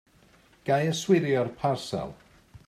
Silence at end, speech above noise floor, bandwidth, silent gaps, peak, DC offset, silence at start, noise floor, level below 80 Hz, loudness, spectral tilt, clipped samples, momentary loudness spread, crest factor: 0.1 s; 33 dB; 14.5 kHz; none; -8 dBFS; under 0.1%; 0.65 s; -59 dBFS; -60 dBFS; -27 LUFS; -5.5 dB/octave; under 0.1%; 13 LU; 20 dB